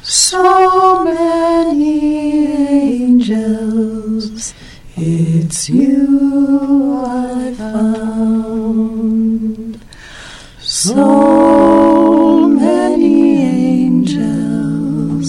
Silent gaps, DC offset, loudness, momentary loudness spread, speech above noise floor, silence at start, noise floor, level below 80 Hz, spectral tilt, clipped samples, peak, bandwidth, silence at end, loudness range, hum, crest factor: none; under 0.1%; -12 LUFS; 12 LU; 24 dB; 0.05 s; -34 dBFS; -40 dBFS; -5 dB/octave; under 0.1%; 0 dBFS; 14 kHz; 0 s; 7 LU; none; 12 dB